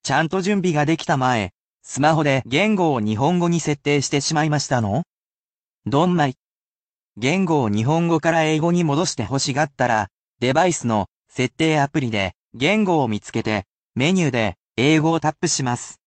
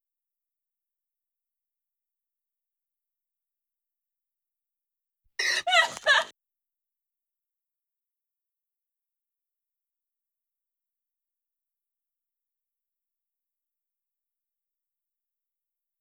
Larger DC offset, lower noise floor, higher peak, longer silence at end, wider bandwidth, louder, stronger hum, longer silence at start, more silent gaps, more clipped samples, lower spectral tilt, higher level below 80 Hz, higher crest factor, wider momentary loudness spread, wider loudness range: neither; about the same, under -90 dBFS vs -87 dBFS; first, -4 dBFS vs -8 dBFS; second, 0.15 s vs 9.7 s; second, 9.2 kHz vs over 20 kHz; first, -20 LUFS vs -23 LUFS; neither; second, 0.05 s vs 5.4 s; first, 1.60-1.80 s, 5.07-5.82 s, 6.39-7.10 s, 10.11-10.34 s, 11.11-11.23 s, 12.37-12.44 s, 13.70-13.90 s, 14.60-14.69 s vs none; neither; first, -5 dB/octave vs 1.5 dB/octave; first, -54 dBFS vs -84 dBFS; second, 16 dB vs 28 dB; second, 7 LU vs 15 LU; second, 2 LU vs 6 LU